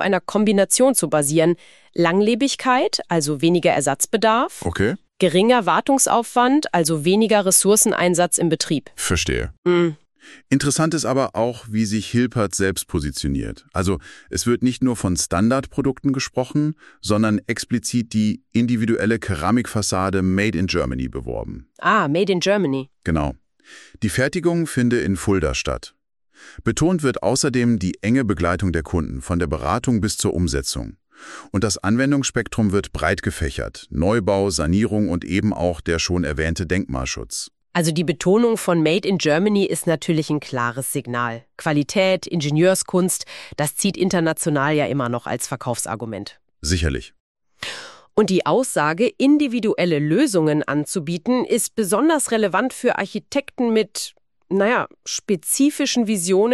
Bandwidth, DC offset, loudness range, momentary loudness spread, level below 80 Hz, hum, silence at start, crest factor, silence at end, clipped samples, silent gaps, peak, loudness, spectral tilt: 13.5 kHz; under 0.1%; 4 LU; 9 LU; -40 dBFS; none; 0 s; 18 dB; 0 s; under 0.1%; 9.58-9.63 s, 47.20-47.35 s; -2 dBFS; -20 LUFS; -4.5 dB/octave